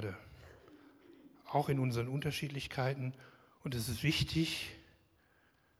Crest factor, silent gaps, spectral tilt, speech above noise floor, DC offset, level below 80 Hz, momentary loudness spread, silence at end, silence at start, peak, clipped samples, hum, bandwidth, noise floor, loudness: 20 dB; none; -5.5 dB/octave; 35 dB; under 0.1%; -60 dBFS; 24 LU; 1 s; 0 s; -18 dBFS; under 0.1%; none; 16 kHz; -71 dBFS; -37 LUFS